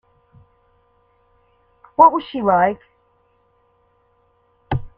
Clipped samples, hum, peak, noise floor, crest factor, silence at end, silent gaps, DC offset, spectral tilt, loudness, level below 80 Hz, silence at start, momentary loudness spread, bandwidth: under 0.1%; none; 0 dBFS; -61 dBFS; 22 dB; 0.1 s; none; under 0.1%; -9 dB/octave; -17 LUFS; -46 dBFS; 2 s; 15 LU; 5 kHz